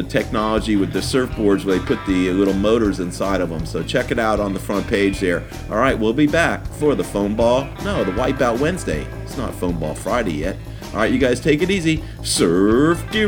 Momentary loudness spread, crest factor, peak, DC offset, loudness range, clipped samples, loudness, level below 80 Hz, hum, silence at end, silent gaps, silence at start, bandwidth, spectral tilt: 8 LU; 18 dB; -2 dBFS; under 0.1%; 3 LU; under 0.1%; -19 LUFS; -34 dBFS; none; 0 s; none; 0 s; 18.5 kHz; -5.5 dB/octave